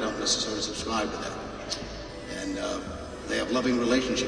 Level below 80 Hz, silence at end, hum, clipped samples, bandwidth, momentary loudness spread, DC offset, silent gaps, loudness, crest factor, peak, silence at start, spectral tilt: -48 dBFS; 0 s; none; under 0.1%; 10.5 kHz; 12 LU; under 0.1%; none; -29 LUFS; 18 dB; -12 dBFS; 0 s; -3 dB/octave